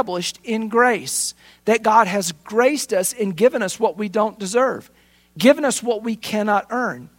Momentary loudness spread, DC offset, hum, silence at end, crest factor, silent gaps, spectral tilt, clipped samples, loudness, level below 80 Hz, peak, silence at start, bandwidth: 8 LU; under 0.1%; none; 0.1 s; 20 dB; none; -3.5 dB/octave; under 0.1%; -19 LUFS; -64 dBFS; 0 dBFS; 0 s; 16.5 kHz